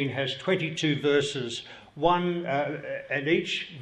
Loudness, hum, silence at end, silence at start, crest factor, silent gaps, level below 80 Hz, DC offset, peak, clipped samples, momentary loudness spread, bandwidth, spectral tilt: -27 LUFS; none; 0 s; 0 s; 18 dB; none; -60 dBFS; under 0.1%; -10 dBFS; under 0.1%; 10 LU; 11 kHz; -5 dB/octave